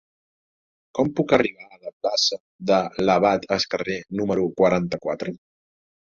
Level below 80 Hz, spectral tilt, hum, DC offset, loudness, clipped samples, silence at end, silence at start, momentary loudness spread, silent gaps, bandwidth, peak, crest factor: -56 dBFS; -4.5 dB/octave; none; under 0.1%; -22 LUFS; under 0.1%; 0.75 s; 0.95 s; 11 LU; 1.93-2.01 s, 2.40-2.59 s; 7.6 kHz; -2 dBFS; 20 dB